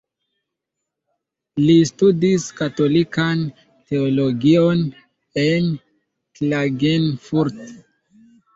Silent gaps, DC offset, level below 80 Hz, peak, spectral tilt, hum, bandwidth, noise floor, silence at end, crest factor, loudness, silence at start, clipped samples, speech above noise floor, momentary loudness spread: none; under 0.1%; -56 dBFS; -4 dBFS; -6.5 dB/octave; none; 8 kHz; -81 dBFS; 0.8 s; 16 dB; -18 LUFS; 1.55 s; under 0.1%; 63 dB; 11 LU